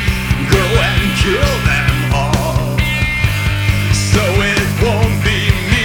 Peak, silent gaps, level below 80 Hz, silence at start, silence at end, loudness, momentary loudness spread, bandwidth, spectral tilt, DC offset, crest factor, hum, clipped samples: 0 dBFS; none; -22 dBFS; 0 s; 0 s; -14 LUFS; 3 LU; over 20 kHz; -5 dB/octave; under 0.1%; 14 dB; none; under 0.1%